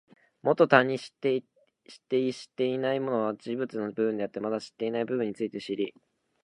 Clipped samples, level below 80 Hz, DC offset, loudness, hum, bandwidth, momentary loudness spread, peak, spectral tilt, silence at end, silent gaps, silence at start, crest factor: under 0.1%; -78 dBFS; under 0.1%; -29 LUFS; none; 10.5 kHz; 11 LU; -2 dBFS; -6 dB/octave; 0.55 s; none; 0.45 s; 28 dB